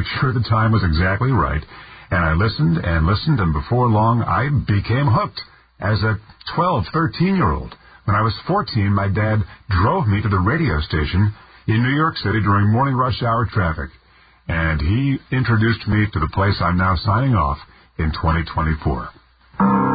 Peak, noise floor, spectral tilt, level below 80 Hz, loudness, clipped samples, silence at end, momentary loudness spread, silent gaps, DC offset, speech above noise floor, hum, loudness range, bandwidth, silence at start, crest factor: -4 dBFS; -49 dBFS; -12 dB/octave; -30 dBFS; -19 LUFS; under 0.1%; 0 s; 9 LU; none; under 0.1%; 31 dB; none; 2 LU; 5 kHz; 0 s; 14 dB